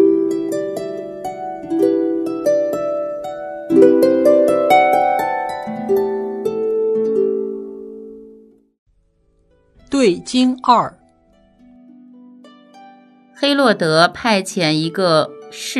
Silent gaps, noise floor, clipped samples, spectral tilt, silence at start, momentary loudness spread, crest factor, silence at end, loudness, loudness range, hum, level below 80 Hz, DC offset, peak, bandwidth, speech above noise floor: 8.79-8.86 s; -59 dBFS; under 0.1%; -5 dB/octave; 0 s; 15 LU; 18 dB; 0 s; -17 LUFS; 8 LU; none; -58 dBFS; under 0.1%; 0 dBFS; 13.5 kHz; 43 dB